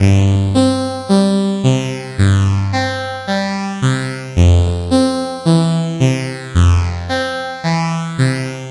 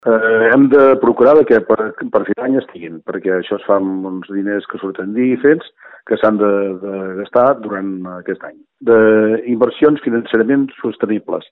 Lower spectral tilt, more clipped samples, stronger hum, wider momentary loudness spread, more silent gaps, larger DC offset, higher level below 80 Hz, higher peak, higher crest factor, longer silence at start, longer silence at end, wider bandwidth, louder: second, -6.5 dB/octave vs -9 dB/octave; neither; neither; second, 7 LU vs 14 LU; neither; neither; first, -36 dBFS vs -58 dBFS; about the same, -2 dBFS vs 0 dBFS; about the same, 14 dB vs 14 dB; about the same, 0 s vs 0.05 s; about the same, 0 s vs 0.1 s; first, 11.5 kHz vs 4.1 kHz; about the same, -15 LUFS vs -14 LUFS